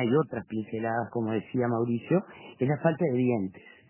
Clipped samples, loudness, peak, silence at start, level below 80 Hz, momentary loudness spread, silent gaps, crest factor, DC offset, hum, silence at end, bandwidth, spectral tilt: under 0.1%; -29 LUFS; -10 dBFS; 0 s; -66 dBFS; 8 LU; none; 18 dB; under 0.1%; none; 0.2 s; 3.2 kHz; -7.5 dB/octave